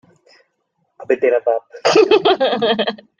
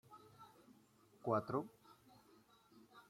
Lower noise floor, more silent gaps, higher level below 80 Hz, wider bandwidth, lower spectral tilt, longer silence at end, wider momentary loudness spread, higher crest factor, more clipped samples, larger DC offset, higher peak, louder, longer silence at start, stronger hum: about the same, -69 dBFS vs -70 dBFS; neither; first, -64 dBFS vs -84 dBFS; second, 9.4 kHz vs 16.5 kHz; second, -4 dB/octave vs -8 dB/octave; first, 0.25 s vs 0.1 s; second, 8 LU vs 27 LU; second, 16 dB vs 24 dB; neither; neither; first, 0 dBFS vs -24 dBFS; first, -15 LUFS vs -43 LUFS; first, 1 s vs 0.1 s; neither